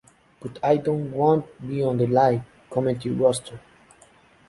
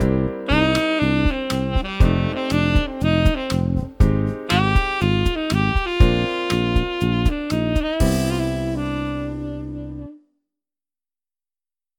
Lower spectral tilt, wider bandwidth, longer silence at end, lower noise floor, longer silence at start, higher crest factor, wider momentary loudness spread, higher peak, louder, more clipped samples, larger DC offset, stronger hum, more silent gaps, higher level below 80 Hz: about the same, -7 dB/octave vs -6.5 dB/octave; second, 11.5 kHz vs 17.5 kHz; second, 0.9 s vs 1.8 s; second, -55 dBFS vs under -90 dBFS; first, 0.4 s vs 0 s; about the same, 18 dB vs 18 dB; first, 12 LU vs 9 LU; second, -6 dBFS vs -2 dBFS; second, -23 LUFS vs -20 LUFS; neither; neither; neither; neither; second, -58 dBFS vs -26 dBFS